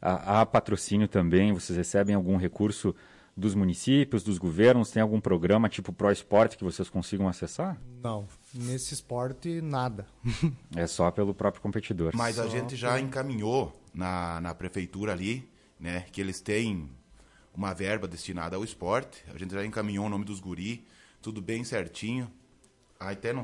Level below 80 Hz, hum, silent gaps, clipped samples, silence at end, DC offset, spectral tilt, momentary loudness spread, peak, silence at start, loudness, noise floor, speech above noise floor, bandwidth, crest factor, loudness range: -56 dBFS; none; none; under 0.1%; 0 s; under 0.1%; -6 dB/octave; 13 LU; -10 dBFS; 0 s; -29 LUFS; -62 dBFS; 34 dB; 11.5 kHz; 20 dB; 9 LU